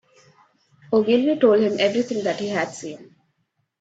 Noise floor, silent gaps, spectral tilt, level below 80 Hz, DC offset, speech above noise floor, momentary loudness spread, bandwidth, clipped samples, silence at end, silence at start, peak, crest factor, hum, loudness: -72 dBFS; none; -5 dB/octave; -68 dBFS; under 0.1%; 52 dB; 16 LU; 8 kHz; under 0.1%; 0.8 s; 0.9 s; -4 dBFS; 18 dB; none; -20 LUFS